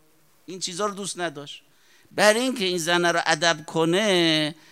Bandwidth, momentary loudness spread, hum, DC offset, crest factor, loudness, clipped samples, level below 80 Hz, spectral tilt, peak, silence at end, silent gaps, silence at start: 16 kHz; 16 LU; none; under 0.1%; 24 dB; -22 LUFS; under 0.1%; -74 dBFS; -3 dB/octave; 0 dBFS; 0.2 s; none; 0.5 s